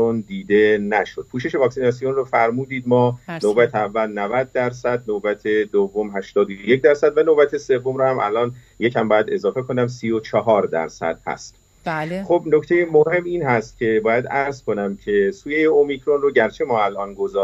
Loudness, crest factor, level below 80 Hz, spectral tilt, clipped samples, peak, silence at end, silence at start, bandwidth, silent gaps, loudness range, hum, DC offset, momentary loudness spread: -19 LUFS; 18 dB; -54 dBFS; -6.5 dB/octave; under 0.1%; -2 dBFS; 0 s; 0 s; 9 kHz; none; 3 LU; none; under 0.1%; 9 LU